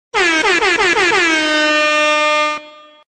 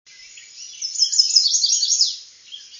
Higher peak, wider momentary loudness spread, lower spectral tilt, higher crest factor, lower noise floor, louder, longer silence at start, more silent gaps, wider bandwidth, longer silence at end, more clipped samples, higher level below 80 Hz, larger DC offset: second, -4 dBFS vs 0 dBFS; second, 3 LU vs 23 LU; first, -1 dB/octave vs 7.5 dB/octave; second, 12 dB vs 20 dB; second, -35 dBFS vs -43 dBFS; first, -12 LUFS vs -15 LUFS; about the same, 0.15 s vs 0.2 s; neither; first, 12.5 kHz vs 7.6 kHz; first, 0.45 s vs 0 s; neither; first, -48 dBFS vs -80 dBFS; neither